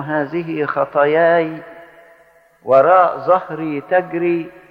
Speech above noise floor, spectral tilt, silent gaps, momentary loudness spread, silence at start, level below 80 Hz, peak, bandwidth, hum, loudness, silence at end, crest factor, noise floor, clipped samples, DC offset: 35 dB; -8.5 dB/octave; none; 12 LU; 0 s; -62 dBFS; -2 dBFS; 5.2 kHz; none; -16 LUFS; 0.2 s; 16 dB; -51 dBFS; under 0.1%; under 0.1%